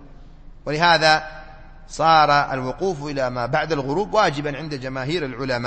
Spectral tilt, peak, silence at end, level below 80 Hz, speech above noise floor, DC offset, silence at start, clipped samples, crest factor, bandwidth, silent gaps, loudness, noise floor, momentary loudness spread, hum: -4.5 dB/octave; -2 dBFS; 0 s; -42 dBFS; 21 dB; under 0.1%; 0 s; under 0.1%; 20 dB; 8.8 kHz; none; -20 LUFS; -41 dBFS; 13 LU; none